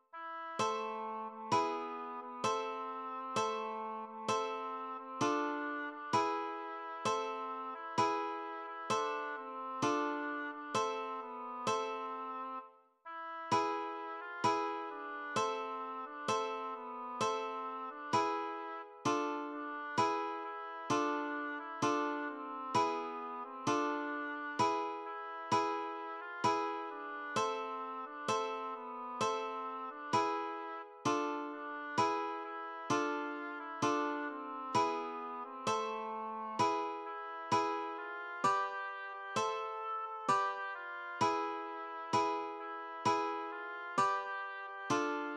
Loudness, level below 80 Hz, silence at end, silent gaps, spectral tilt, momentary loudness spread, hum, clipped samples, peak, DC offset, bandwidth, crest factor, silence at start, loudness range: -37 LUFS; -84 dBFS; 0 s; none; -4 dB/octave; 9 LU; none; under 0.1%; -20 dBFS; under 0.1%; 12 kHz; 18 dB; 0.15 s; 2 LU